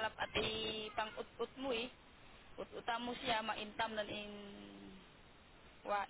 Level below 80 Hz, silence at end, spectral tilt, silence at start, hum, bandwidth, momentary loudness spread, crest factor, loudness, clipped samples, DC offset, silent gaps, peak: -66 dBFS; 0 s; -1 dB/octave; 0 s; none; 4 kHz; 22 LU; 18 dB; -42 LUFS; under 0.1%; under 0.1%; none; -24 dBFS